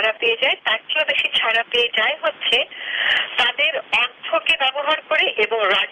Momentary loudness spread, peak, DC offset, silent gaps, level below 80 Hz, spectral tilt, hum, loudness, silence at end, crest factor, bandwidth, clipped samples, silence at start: 4 LU; -6 dBFS; under 0.1%; none; -62 dBFS; -1 dB/octave; none; -18 LUFS; 0 s; 14 dB; 12.5 kHz; under 0.1%; 0 s